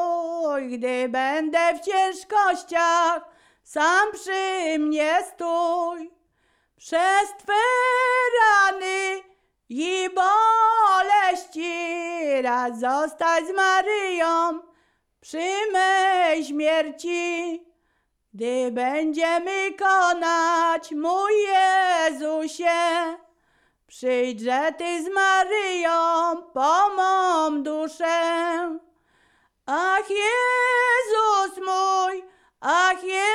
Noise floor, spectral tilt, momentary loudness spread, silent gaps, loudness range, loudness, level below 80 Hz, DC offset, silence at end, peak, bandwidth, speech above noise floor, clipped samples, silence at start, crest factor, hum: -71 dBFS; -1 dB/octave; 9 LU; none; 3 LU; -22 LUFS; -68 dBFS; under 0.1%; 0 s; -6 dBFS; 13.5 kHz; 49 dB; under 0.1%; 0 s; 16 dB; none